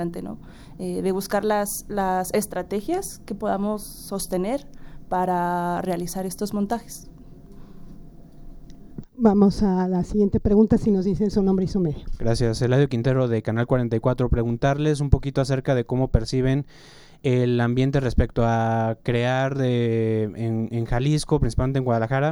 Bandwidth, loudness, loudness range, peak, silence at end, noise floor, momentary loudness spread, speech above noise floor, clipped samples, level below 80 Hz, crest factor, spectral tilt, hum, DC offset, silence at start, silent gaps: 18 kHz; -23 LUFS; 6 LU; -2 dBFS; 0 s; -42 dBFS; 9 LU; 20 dB; under 0.1%; -36 dBFS; 20 dB; -7 dB/octave; none; under 0.1%; 0 s; none